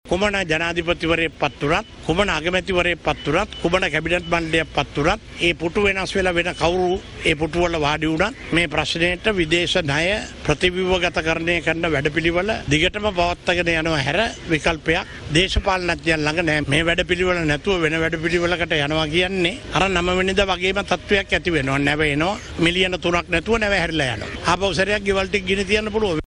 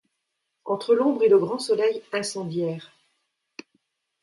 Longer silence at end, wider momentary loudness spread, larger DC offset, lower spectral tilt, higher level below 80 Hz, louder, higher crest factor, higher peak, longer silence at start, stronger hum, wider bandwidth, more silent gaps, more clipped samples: second, 0 s vs 1.35 s; second, 3 LU vs 11 LU; neither; about the same, -4.5 dB/octave vs -5 dB/octave; first, -36 dBFS vs -76 dBFS; first, -20 LUFS vs -23 LUFS; about the same, 18 dB vs 18 dB; first, -2 dBFS vs -8 dBFS; second, 0.05 s vs 0.65 s; neither; about the same, 11 kHz vs 11.5 kHz; neither; neither